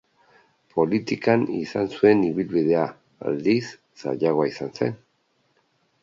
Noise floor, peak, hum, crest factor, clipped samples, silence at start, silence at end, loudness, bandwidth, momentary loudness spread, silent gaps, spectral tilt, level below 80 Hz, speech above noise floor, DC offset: -68 dBFS; -4 dBFS; none; 20 dB; under 0.1%; 0.75 s; 1.1 s; -23 LUFS; 7.6 kHz; 12 LU; none; -7 dB/octave; -64 dBFS; 46 dB; under 0.1%